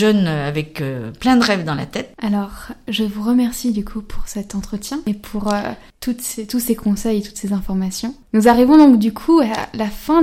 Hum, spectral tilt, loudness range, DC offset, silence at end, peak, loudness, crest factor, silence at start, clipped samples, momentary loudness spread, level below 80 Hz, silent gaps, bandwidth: none; -5.5 dB/octave; 8 LU; under 0.1%; 0 s; -2 dBFS; -18 LUFS; 16 dB; 0 s; under 0.1%; 14 LU; -38 dBFS; none; 16.5 kHz